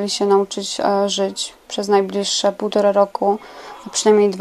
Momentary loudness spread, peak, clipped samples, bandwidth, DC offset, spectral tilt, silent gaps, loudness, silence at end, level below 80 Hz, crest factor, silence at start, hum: 10 LU; -2 dBFS; under 0.1%; 12.5 kHz; under 0.1%; -3.5 dB/octave; none; -18 LUFS; 0 s; -62 dBFS; 16 dB; 0 s; none